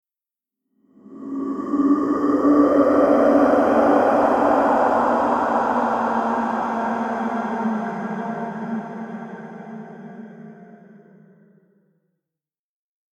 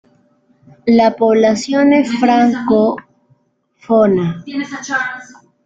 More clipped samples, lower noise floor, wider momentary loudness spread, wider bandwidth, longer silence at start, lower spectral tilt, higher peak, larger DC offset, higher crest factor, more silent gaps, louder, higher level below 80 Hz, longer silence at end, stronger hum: neither; first, -90 dBFS vs -58 dBFS; first, 20 LU vs 12 LU; about the same, 8.2 kHz vs 8 kHz; first, 1.1 s vs 0.85 s; first, -7.5 dB/octave vs -6 dB/octave; about the same, -4 dBFS vs -2 dBFS; neither; about the same, 18 dB vs 14 dB; neither; second, -19 LUFS vs -14 LUFS; about the same, -56 dBFS vs -56 dBFS; first, 2.5 s vs 0.4 s; neither